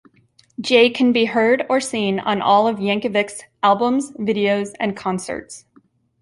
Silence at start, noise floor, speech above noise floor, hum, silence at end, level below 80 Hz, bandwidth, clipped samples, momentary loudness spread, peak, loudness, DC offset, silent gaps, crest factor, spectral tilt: 0.6 s; -57 dBFS; 39 dB; none; 0.65 s; -62 dBFS; 11.5 kHz; under 0.1%; 14 LU; -2 dBFS; -18 LUFS; under 0.1%; none; 16 dB; -4.5 dB/octave